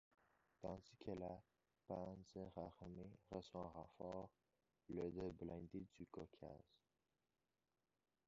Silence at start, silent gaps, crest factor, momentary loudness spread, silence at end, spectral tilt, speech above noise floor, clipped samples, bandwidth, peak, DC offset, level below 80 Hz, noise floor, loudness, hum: 0.6 s; none; 20 dB; 8 LU; 1.7 s; -7.5 dB/octave; over 36 dB; under 0.1%; 7.4 kHz; -36 dBFS; under 0.1%; -72 dBFS; under -90 dBFS; -55 LUFS; none